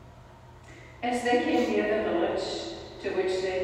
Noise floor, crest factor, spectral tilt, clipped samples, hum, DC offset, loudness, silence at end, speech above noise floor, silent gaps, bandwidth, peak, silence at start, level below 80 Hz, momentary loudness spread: -50 dBFS; 16 dB; -4.5 dB/octave; under 0.1%; none; under 0.1%; -28 LUFS; 0 s; 23 dB; none; 14.5 kHz; -14 dBFS; 0 s; -56 dBFS; 15 LU